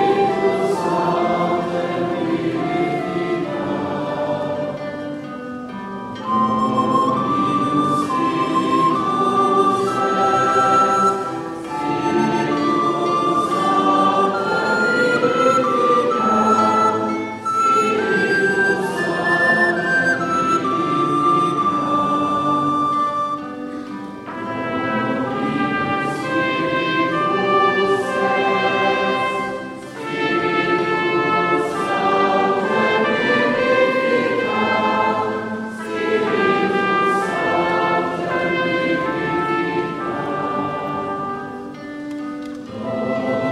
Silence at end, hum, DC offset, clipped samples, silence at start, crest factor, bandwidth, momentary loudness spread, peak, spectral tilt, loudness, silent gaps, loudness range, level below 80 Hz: 0 s; none; under 0.1%; under 0.1%; 0 s; 16 dB; 13 kHz; 11 LU; -4 dBFS; -5.5 dB/octave; -18 LUFS; none; 6 LU; -56 dBFS